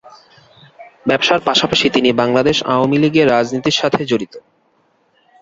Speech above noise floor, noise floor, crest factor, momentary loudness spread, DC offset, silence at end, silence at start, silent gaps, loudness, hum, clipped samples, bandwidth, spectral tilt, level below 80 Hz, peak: 44 dB; -59 dBFS; 16 dB; 6 LU; under 0.1%; 1 s; 0.05 s; none; -14 LUFS; none; under 0.1%; 7.8 kHz; -4.5 dB/octave; -50 dBFS; 0 dBFS